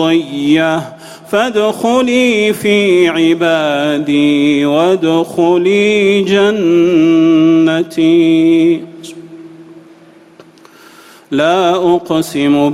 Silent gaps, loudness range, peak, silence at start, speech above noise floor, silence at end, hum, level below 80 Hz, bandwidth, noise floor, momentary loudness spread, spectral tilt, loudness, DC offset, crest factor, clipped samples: none; 7 LU; 0 dBFS; 0 s; 30 dB; 0 s; none; -54 dBFS; 14 kHz; -41 dBFS; 6 LU; -5.5 dB/octave; -11 LUFS; under 0.1%; 12 dB; under 0.1%